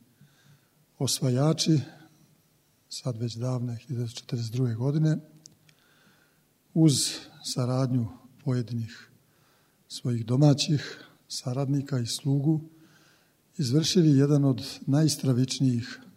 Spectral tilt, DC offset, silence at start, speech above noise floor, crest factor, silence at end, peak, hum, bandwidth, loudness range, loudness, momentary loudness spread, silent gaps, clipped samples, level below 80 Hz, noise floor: -5.5 dB/octave; under 0.1%; 1 s; 40 dB; 18 dB; 0.05 s; -8 dBFS; none; 16 kHz; 6 LU; -27 LUFS; 14 LU; none; under 0.1%; -68 dBFS; -66 dBFS